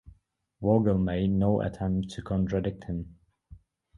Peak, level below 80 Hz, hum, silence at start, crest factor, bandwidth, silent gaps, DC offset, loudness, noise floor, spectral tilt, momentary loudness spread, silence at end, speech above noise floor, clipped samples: -10 dBFS; -46 dBFS; none; 0.05 s; 18 dB; 11 kHz; none; under 0.1%; -28 LUFS; -62 dBFS; -9 dB/octave; 12 LU; 0.4 s; 35 dB; under 0.1%